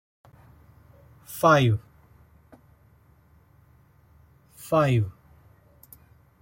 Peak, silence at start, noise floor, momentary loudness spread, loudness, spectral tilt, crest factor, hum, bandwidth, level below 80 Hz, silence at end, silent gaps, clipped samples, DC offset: -6 dBFS; 1.3 s; -58 dBFS; 18 LU; -23 LUFS; -6.5 dB/octave; 22 dB; none; 16.5 kHz; -58 dBFS; 1.3 s; none; under 0.1%; under 0.1%